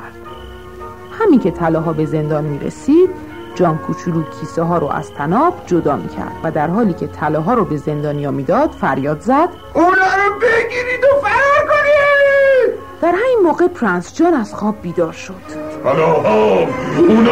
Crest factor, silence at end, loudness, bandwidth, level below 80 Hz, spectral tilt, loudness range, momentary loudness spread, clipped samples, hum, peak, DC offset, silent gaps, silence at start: 14 dB; 0 s; -15 LUFS; 15 kHz; -44 dBFS; -7 dB/octave; 5 LU; 11 LU; under 0.1%; none; -2 dBFS; 0.7%; none; 0 s